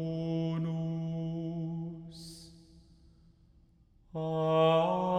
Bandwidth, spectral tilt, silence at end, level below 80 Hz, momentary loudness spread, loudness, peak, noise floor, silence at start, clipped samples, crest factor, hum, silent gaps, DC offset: 10.5 kHz; -8 dB/octave; 0 s; -62 dBFS; 21 LU; -32 LUFS; -16 dBFS; -63 dBFS; 0 s; under 0.1%; 18 dB; none; none; under 0.1%